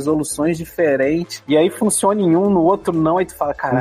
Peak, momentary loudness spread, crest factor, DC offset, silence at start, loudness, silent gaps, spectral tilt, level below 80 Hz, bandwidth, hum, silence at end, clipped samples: -4 dBFS; 6 LU; 12 dB; under 0.1%; 0 s; -17 LUFS; none; -5.5 dB/octave; -48 dBFS; 15.5 kHz; none; 0 s; under 0.1%